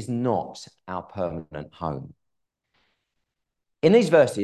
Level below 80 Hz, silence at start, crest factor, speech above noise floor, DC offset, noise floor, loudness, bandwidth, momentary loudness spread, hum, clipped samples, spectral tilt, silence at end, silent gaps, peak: -56 dBFS; 0 s; 20 dB; 57 dB; under 0.1%; -80 dBFS; -23 LUFS; 12.5 kHz; 20 LU; none; under 0.1%; -6.5 dB/octave; 0 s; none; -6 dBFS